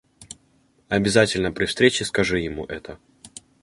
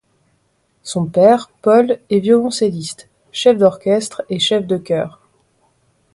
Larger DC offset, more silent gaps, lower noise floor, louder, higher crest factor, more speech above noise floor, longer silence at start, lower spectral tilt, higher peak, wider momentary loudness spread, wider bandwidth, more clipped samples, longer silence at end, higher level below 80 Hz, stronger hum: neither; neither; about the same, -61 dBFS vs -62 dBFS; second, -21 LUFS vs -15 LUFS; first, 22 dB vs 16 dB; second, 40 dB vs 48 dB; second, 0.2 s vs 0.85 s; about the same, -4 dB/octave vs -5 dB/octave; about the same, -2 dBFS vs 0 dBFS; first, 24 LU vs 15 LU; about the same, 11.5 kHz vs 11.5 kHz; neither; second, 0.35 s vs 1.05 s; first, -48 dBFS vs -60 dBFS; neither